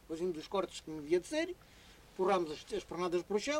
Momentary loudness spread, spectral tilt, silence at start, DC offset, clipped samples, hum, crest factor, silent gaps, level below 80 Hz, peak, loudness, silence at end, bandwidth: 9 LU; -4.5 dB/octave; 0.1 s; under 0.1%; under 0.1%; none; 16 dB; none; -64 dBFS; -20 dBFS; -37 LUFS; 0 s; 15.5 kHz